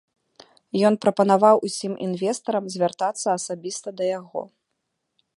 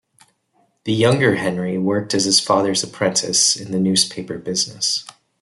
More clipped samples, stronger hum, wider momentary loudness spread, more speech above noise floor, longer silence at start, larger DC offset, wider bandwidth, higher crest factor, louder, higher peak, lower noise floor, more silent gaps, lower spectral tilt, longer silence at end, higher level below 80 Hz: neither; neither; first, 13 LU vs 8 LU; first, 56 dB vs 44 dB; about the same, 0.75 s vs 0.85 s; neither; about the same, 11.5 kHz vs 12 kHz; about the same, 20 dB vs 18 dB; second, -22 LUFS vs -18 LUFS; about the same, -4 dBFS vs -2 dBFS; first, -78 dBFS vs -63 dBFS; neither; first, -5 dB/octave vs -3 dB/octave; first, 0.9 s vs 0.3 s; second, -76 dBFS vs -60 dBFS